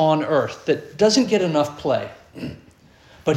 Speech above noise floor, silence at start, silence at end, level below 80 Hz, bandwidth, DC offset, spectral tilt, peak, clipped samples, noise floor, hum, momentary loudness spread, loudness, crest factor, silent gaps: 30 dB; 0 s; 0 s; -56 dBFS; 13 kHz; under 0.1%; -5 dB/octave; -4 dBFS; under 0.1%; -50 dBFS; none; 17 LU; -20 LUFS; 16 dB; none